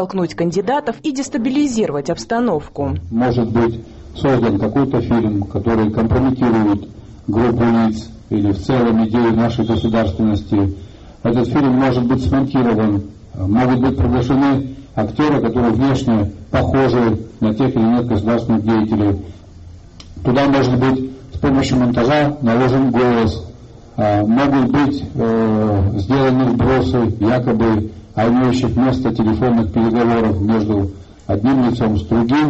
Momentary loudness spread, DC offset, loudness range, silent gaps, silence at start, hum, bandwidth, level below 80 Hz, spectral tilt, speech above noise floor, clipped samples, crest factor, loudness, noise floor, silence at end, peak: 7 LU; under 0.1%; 2 LU; none; 0 s; none; 8.2 kHz; -36 dBFS; -7.5 dB/octave; 22 dB; under 0.1%; 10 dB; -16 LUFS; -37 dBFS; 0 s; -4 dBFS